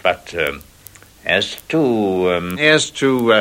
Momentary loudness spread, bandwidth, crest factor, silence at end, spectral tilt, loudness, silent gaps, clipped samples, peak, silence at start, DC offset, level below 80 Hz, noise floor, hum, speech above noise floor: 8 LU; 16.5 kHz; 18 dB; 0 s; -4 dB/octave; -17 LUFS; none; under 0.1%; 0 dBFS; 0.05 s; under 0.1%; -50 dBFS; -43 dBFS; none; 27 dB